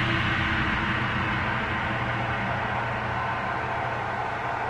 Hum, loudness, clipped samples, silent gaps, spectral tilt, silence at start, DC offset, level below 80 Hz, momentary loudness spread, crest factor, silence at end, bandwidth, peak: none; -27 LUFS; under 0.1%; none; -6 dB/octave; 0 s; under 0.1%; -42 dBFS; 4 LU; 16 dB; 0 s; 10 kHz; -10 dBFS